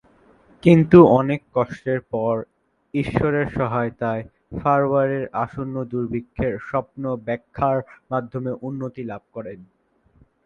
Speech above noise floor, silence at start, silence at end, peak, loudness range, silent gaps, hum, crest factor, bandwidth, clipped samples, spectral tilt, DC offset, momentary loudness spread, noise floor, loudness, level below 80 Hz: 38 dB; 0.65 s; 0.8 s; 0 dBFS; 9 LU; none; none; 22 dB; 6.8 kHz; under 0.1%; -9.5 dB/octave; under 0.1%; 15 LU; -58 dBFS; -21 LUFS; -48 dBFS